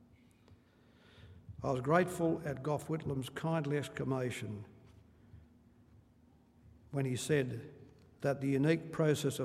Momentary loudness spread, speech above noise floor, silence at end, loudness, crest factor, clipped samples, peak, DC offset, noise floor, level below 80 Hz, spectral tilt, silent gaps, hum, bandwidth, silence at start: 14 LU; 31 dB; 0 s; -35 LUFS; 22 dB; under 0.1%; -14 dBFS; under 0.1%; -65 dBFS; -68 dBFS; -6 dB/octave; none; none; 15.5 kHz; 0.5 s